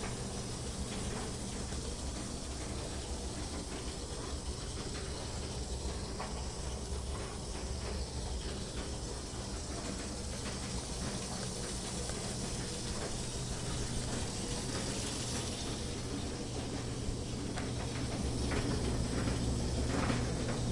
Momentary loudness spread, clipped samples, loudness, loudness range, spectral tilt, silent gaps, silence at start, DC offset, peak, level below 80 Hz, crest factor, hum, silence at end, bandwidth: 6 LU; under 0.1%; -39 LUFS; 4 LU; -4 dB/octave; none; 0 s; under 0.1%; -18 dBFS; -44 dBFS; 18 dB; none; 0 s; 11.5 kHz